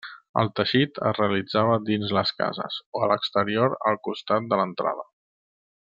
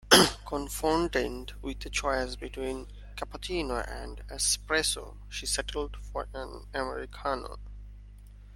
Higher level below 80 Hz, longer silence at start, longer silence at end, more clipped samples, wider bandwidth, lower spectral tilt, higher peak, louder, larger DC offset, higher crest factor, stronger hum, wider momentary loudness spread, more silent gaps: second, -68 dBFS vs -42 dBFS; about the same, 0.05 s vs 0.05 s; first, 0.8 s vs 0 s; neither; second, 7.6 kHz vs 16.5 kHz; first, -7.5 dB/octave vs -2.5 dB/octave; about the same, -6 dBFS vs -4 dBFS; first, -24 LUFS vs -30 LUFS; neither; second, 20 dB vs 28 dB; second, none vs 50 Hz at -40 dBFS; second, 7 LU vs 14 LU; first, 0.29-0.34 s, 2.86-2.93 s vs none